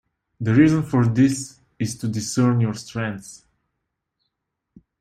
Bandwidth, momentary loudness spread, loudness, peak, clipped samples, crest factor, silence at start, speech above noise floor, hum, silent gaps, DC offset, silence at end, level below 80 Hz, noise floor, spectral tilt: 14 kHz; 13 LU; -21 LUFS; -4 dBFS; under 0.1%; 18 dB; 0.4 s; 60 dB; none; none; under 0.1%; 1.65 s; -56 dBFS; -79 dBFS; -6.5 dB/octave